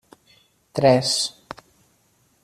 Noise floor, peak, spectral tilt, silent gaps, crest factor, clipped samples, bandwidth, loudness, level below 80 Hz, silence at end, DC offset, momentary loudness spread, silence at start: -63 dBFS; -4 dBFS; -4 dB/octave; none; 22 dB; under 0.1%; 14.5 kHz; -20 LUFS; -62 dBFS; 1.15 s; under 0.1%; 24 LU; 0.75 s